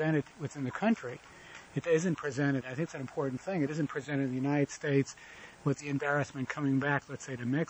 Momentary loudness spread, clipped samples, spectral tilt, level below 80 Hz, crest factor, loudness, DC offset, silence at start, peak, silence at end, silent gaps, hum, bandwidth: 11 LU; under 0.1%; -6.5 dB/octave; -68 dBFS; 18 dB; -33 LUFS; under 0.1%; 0 s; -14 dBFS; 0.05 s; none; none; 8.6 kHz